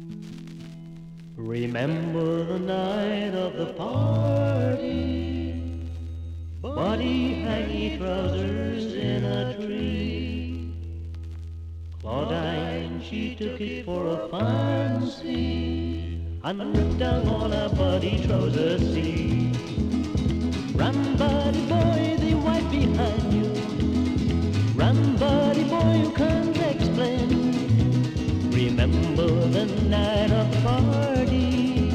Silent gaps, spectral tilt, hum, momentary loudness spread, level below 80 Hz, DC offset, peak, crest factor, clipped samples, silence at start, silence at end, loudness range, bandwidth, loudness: none; -7.5 dB/octave; none; 12 LU; -36 dBFS; under 0.1%; -10 dBFS; 14 dB; under 0.1%; 0 s; 0 s; 7 LU; 10 kHz; -25 LUFS